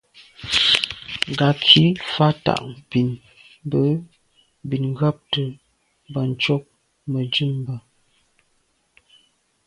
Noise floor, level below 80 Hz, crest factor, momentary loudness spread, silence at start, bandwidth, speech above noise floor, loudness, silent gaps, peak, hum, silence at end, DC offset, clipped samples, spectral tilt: -66 dBFS; -54 dBFS; 22 dB; 18 LU; 0.2 s; 11.5 kHz; 46 dB; -20 LUFS; none; 0 dBFS; none; 1.85 s; under 0.1%; under 0.1%; -5.5 dB/octave